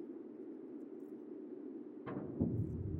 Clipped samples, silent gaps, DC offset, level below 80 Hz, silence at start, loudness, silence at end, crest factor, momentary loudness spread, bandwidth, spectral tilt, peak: under 0.1%; none; under 0.1%; -60 dBFS; 0 s; -45 LUFS; 0 s; 22 dB; 12 LU; 3.9 kHz; -11.5 dB/octave; -22 dBFS